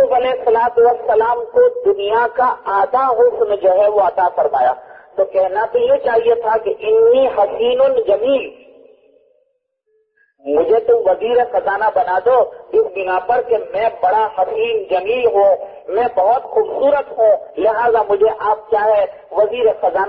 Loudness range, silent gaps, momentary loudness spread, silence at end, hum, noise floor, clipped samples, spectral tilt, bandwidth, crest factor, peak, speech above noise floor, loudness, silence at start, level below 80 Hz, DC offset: 3 LU; none; 5 LU; 0 s; none; -66 dBFS; under 0.1%; -8 dB/octave; 4.7 kHz; 12 dB; -4 dBFS; 52 dB; -15 LUFS; 0 s; -54 dBFS; under 0.1%